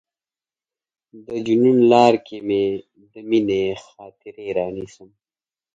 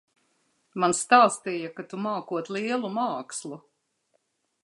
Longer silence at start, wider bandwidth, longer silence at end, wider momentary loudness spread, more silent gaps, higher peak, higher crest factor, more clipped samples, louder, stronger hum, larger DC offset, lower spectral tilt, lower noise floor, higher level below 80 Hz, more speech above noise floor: first, 1.15 s vs 0.75 s; second, 7.8 kHz vs 11.5 kHz; second, 0.7 s vs 1.05 s; first, 21 LU vs 17 LU; neither; first, 0 dBFS vs -4 dBFS; about the same, 20 dB vs 22 dB; neither; first, -19 LUFS vs -26 LUFS; neither; neither; first, -6.5 dB/octave vs -3.5 dB/octave; first, under -90 dBFS vs -73 dBFS; first, -60 dBFS vs -78 dBFS; first, over 71 dB vs 47 dB